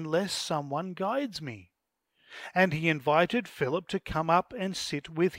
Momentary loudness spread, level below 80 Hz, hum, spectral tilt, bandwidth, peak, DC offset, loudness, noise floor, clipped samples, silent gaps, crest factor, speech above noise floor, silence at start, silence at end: 12 LU; -58 dBFS; none; -5 dB/octave; 16 kHz; -8 dBFS; under 0.1%; -29 LUFS; -79 dBFS; under 0.1%; none; 22 dB; 50 dB; 0 s; 0 s